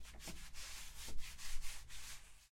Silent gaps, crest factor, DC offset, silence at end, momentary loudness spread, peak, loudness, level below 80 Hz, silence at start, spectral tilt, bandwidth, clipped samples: none; 16 dB; under 0.1%; 0.05 s; 3 LU; -28 dBFS; -52 LUFS; -52 dBFS; 0 s; -1.5 dB/octave; 16.5 kHz; under 0.1%